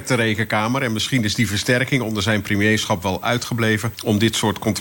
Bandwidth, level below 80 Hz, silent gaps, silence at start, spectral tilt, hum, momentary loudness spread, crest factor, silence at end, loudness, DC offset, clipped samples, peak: 17 kHz; -54 dBFS; none; 0 s; -4.5 dB/octave; none; 4 LU; 16 dB; 0 s; -19 LUFS; under 0.1%; under 0.1%; -4 dBFS